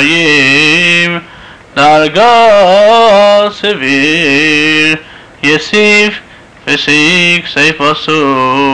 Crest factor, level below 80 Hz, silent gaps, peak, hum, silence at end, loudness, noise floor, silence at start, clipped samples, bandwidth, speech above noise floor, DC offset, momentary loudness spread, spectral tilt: 8 dB; -46 dBFS; none; 0 dBFS; none; 0 s; -6 LUFS; -33 dBFS; 0 s; under 0.1%; 11 kHz; 25 dB; 0.9%; 8 LU; -3.5 dB/octave